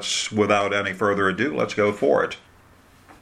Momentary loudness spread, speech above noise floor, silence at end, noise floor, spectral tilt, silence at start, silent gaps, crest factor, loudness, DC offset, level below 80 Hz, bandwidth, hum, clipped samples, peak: 4 LU; 31 dB; 0.85 s; -52 dBFS; -4 dB/octave; 0 s; none; 20 dB; -22 LUFS; under 0.1%; -60 dBFS; 13.5 kHz; none; under 0.1%; -4 dBFS